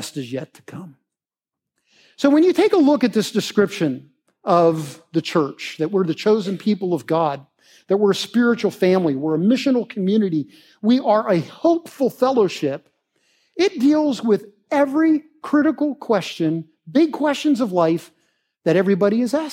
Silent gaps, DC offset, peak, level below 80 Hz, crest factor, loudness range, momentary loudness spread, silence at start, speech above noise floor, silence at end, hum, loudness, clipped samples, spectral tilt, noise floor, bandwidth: none; under 0.1%; -2 dBFS; -74 dBFS; 18 dB; 2 LU; 10 LU; 0 s; 70 dB; 0 s; none; -19 LUFS; under 0.1%; -6 dB/octave; -88 dBFS; 16 kHz